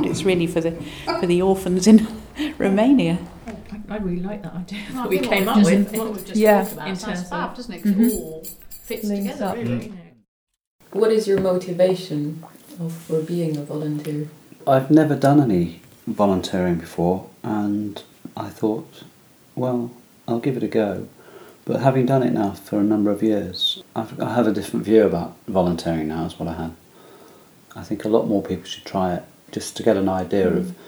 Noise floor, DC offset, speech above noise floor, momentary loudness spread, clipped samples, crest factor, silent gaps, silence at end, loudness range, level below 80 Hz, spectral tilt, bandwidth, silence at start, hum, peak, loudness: -48 dBFS; under 0.1%; 28 dB; 16 LU; under 0.1%; 20 dB; 10.28-10.47 s, 10.67-10.79 s; 0 s; 7 LU; -50 dBFS; -6.5 dB/octave; over 20 kHz; 0 s; none; 0 dBFS; -21 LUFS